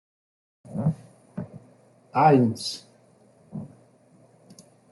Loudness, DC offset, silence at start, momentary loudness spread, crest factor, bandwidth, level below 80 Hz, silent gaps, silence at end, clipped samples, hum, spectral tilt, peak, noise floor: -23 LUFS; under 0.1%; 0.7 s; 23 LU; 22 dB; 12 kHz; -68 dBFS; none; 1.25 s; under 0.1%; none; -6.5 dB/octave; -6 dBFS; -58 dBFS